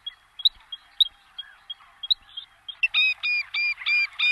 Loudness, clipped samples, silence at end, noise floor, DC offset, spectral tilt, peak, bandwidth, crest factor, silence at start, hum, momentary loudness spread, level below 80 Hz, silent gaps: -22 LUFS; under 0.1%; 0 s; -44 dBFS; under 0.1%; 3 dB/octave; -8 dBFS; 12.5 kHz; 18 dB; 0.05 s; none; 20 LU; -66 dBFS; none